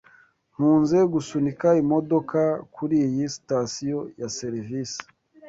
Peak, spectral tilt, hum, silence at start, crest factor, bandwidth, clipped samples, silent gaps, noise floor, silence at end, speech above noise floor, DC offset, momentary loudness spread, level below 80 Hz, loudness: -8 dBFS; -6.5 dB/octave; none; 0.6 s; 16 dB; 7.8 kHz; under 0.1%; none; -57 dBFS; 0 s; 34 dB; under 0.1%; 11 LU; -62 dBFS; -24 LUFS